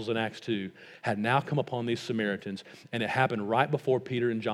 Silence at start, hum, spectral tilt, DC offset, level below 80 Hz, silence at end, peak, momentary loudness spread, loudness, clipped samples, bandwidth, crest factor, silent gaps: 0 s; none; -6.5 dB/octave; under 0.1%; -78 dBFS; 0 s; -8 dBFS; 9 LU; -30 LUFS; under 0.1%; 13 kHz; 22 dB; none